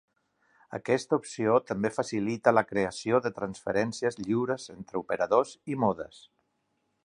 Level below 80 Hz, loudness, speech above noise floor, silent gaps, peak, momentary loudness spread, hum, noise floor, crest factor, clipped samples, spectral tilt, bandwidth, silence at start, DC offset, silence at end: -66 dBFS; -29 LUFS; 48 dB; none; -6 dBFS; 11 LU; none; -76 dBFS; 24 dB; under 0.1%; -5.5 dB/octave; 11 kHz; 0.7 s; under 0.1%; 1 s